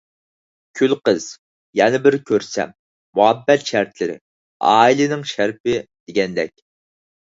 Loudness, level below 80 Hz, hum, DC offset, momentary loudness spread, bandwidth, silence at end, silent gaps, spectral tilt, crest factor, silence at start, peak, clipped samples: -18 LUFS; -60 dBFS; none; under 0.1%; 12 LU; 7.8 kHz; 0.75 s; 1.39-1.73 s, 2.79-3.13 s, 4.21-4.60 s, 5.60-5.64 s, 6.00-6.07 s; -4.5 dB/octave; 18 dB; 0.75 s; 0 dBFS; under 0.1%